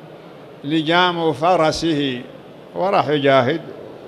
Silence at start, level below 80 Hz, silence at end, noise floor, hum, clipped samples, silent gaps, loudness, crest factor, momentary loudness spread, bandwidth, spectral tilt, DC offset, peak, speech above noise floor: 0 s; -52 dBFS; 0 s; -39 dBFS; none; under 0.1%; none; -18 LUFS; 18 dB; 17 LU; 13 kHz; -5.5 dB/octave; under 0.1%; -2 dBFS; 22 dB